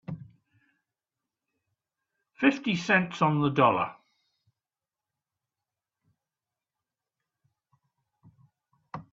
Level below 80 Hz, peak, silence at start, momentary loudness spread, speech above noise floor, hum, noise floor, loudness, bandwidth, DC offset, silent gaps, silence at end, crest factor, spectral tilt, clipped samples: -70 dBFS; -8 dBFS; 0.1 s; 20 LU; over 65 dB; none; under -90 dBFS; -25 LUFS; 7.6 kHz; under 0.1%; none; 0.1 s; 24 dB; -6.5 dB/octave; under 0.1%